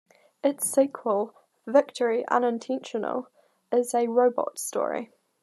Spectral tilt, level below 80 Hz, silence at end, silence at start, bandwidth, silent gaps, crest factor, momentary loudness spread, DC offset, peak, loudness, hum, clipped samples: -3.5 dB/octave; -88 dBFS; 0.35 s; 0.45 s; 13 kHz; none; 20 dB; 10 LU; under 0.1%; -6 dBFS; -26 LUFS; none; under 0.1%